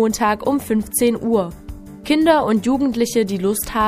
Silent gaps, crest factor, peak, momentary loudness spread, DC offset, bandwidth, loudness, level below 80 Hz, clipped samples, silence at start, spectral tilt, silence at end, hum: none; 16 dB; -2 dBFS; 11 LU; under 0.1%; 15.5 kHz; -18 LUFS; -42 dBFS; under 0.1%; 0 s; -4.5 dB/octave; 0 s; none